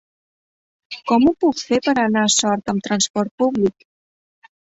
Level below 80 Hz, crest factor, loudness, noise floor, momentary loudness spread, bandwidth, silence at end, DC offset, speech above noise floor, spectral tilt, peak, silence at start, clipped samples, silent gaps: -56 dBFS; 16 dB; -18 LUFS; under -90 dBFS; 7 LU; 8 kHz; 1 s; under 0.1%; over 72 dB; -3.5 dB/octave; -4 dBFS; 0.9 s; under 0.1%; 3.10-3.14 s, 3.31-3.38 s